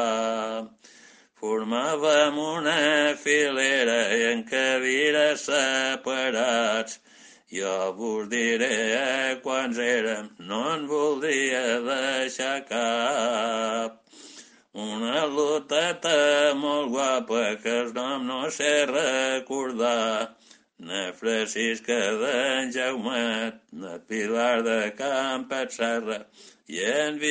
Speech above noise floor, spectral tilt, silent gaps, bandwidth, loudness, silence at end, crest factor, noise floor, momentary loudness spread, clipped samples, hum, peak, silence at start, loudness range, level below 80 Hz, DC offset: 29 dB; -2 dB/octave; none; 9.6 kHz; -25 LUFS; 0 s; 20 dB; -54 dBFS; 10 LU; under 0.1%; none; -6 dBFS; 0 s; 5 LU; -76 dBFS; under 0.1%